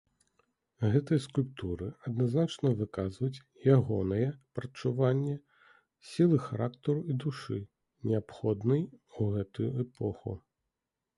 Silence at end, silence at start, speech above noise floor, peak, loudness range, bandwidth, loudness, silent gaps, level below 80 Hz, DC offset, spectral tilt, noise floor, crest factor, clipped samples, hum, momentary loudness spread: 0.8 s; 0.8 s; 57 dB; -12 dBFS; 4 LU; 11.5 kHz; -32 LUFS; none; -56 dBFS; under 0.1%; -8.5 dB/octave; -88 dBFS; 20 dB; under 0.1%; none; 13 LU